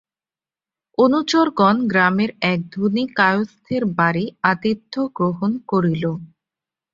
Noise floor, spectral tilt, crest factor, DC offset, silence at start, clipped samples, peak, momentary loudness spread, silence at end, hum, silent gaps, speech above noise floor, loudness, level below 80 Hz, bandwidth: under -90 dBFS; -6.5 dB/octave; 18 dB; under 0.1%; 1 s; under 0.1%; -2 dBFS; 8 LU; 0.65 s; none; none; over 71 dB; -19 LUFS; -60 dBFS; 7.6 kHz